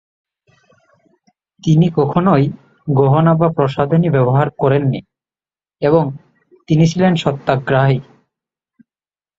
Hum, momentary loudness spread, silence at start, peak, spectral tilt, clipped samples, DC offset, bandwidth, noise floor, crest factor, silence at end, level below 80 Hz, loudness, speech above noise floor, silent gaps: none; 9 LU; 1.65 s; 0 dBFS; -8 dB/octave; under 0.1%; under 0.1%; 7.6 kHz; under -90 dBFS; 16 dB; 1.35 s; -50 dBFS; -15 LUFS; over 77 dB; none